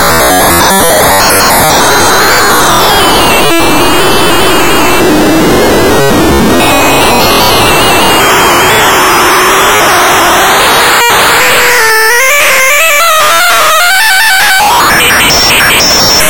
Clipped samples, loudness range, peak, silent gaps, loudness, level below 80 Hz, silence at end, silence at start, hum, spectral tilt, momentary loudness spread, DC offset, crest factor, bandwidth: 0.2%; 2 LU; 0 dBFS; none; -4 LUFS; -26 dBFS; 0 s; 0 s; none; -2 dB/octave; 3 LU; 10%; 6 dB; over 20 kHz